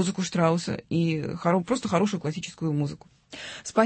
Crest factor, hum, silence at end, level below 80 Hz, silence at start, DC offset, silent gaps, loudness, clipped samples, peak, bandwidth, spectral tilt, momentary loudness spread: 18 dB; none; 0 s; -60 dBFS; 0 s; under 0.1%; none; -27 LUFS; under 0.1%; -8 dBFS; 8.8 kHz; -6 dB/octave; 13 LU